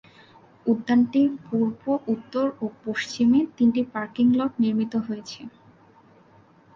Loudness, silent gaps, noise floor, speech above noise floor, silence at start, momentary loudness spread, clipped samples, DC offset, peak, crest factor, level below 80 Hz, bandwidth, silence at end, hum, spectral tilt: -24 LUFS; none; -55 dBFS; 32 dB; 0.65 s; 12 LU; under 0.1%; under 0.1%; -10 dBFS; 14 dB; -64 dBFS; 7.4 kHz; 1.25 s; none; -6 dB/octave